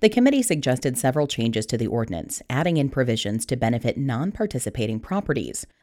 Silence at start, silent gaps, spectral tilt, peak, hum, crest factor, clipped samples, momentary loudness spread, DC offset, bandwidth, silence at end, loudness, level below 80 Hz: 0 s; none; -5 dB/octave; -4 dBFS; none; 20 dB; under 0.1%; 6 LU; under 0.1%; 17 kHz; 0.15 s; -24 LUFS; -48 dBFS